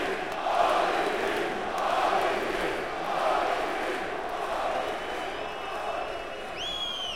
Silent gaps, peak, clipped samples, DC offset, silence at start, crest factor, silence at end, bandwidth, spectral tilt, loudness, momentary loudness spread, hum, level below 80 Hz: none; -10 dBFS; under 0.1%; 0.4%; 0 s; 18 dB; 0 s; 16.5 kHz; -3 dB/octave; -29 LUFS; 8 LU; none; -54 dBFS